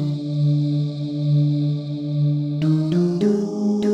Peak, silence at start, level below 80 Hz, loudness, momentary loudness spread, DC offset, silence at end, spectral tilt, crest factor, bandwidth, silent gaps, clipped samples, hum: -8 dBFS; 0 s; -62 dBFS; -21 LUFS; 5 LU; under 0.1%; 0 s; -9 dB/octave; 12 dB; 7.2 kHz; none; under 0.1%; none